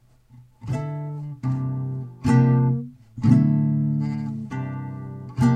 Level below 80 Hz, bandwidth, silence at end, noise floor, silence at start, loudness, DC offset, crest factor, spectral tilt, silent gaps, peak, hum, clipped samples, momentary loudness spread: -50 dBFS; 9 kHz; 0 s; -51 dBFS; 0.35 s; -23 LUFS; under 0.1%; 18 dB; -9 dB/octave; none; -4 dBFS; none; under 0.1%; 15 LU